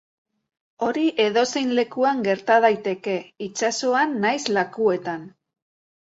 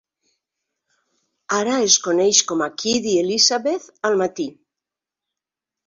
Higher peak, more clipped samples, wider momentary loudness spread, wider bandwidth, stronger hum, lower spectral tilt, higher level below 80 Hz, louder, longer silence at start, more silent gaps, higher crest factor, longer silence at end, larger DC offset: second, -4 dBFS vs 0 dBFS; neither; about the same, 10 LU vs 9 LU; about the same, 8 kHz vs 7.6 kHz; neither; first, -3.5 dB/octave vs -1.5 dB/octave; about the same, -70 dBFS vs -66 dBFS; second, -22 LUFS vs -18 LUFS; second, 0.8 s vs 1.5 s; neither; about the same, 18 dB vs 22 dB; second, 0.8 s vs 1.35 s; neither